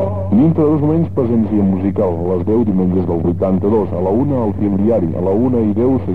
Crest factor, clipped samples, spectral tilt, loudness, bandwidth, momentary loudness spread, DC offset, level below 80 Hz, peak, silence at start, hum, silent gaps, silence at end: 10 dB; under 0.1%; -12 dB/octave; -15 LUFS; 4.2 kHz; 3 LU; 2%; -40 dBFS; -4 dBFS; 0 s; none; none; 0 s